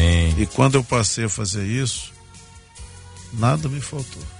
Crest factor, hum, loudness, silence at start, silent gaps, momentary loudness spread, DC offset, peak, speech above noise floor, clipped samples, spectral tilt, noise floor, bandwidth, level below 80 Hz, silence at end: 18 dB; none; -21 LUFS; 0 s; none; 23 LU; under 0.1%; -2 dBFS; 23 dB; under 0.1%; -5 dB/octave; -44 dBFS; 11 kHz; -32 dBFS; 0 s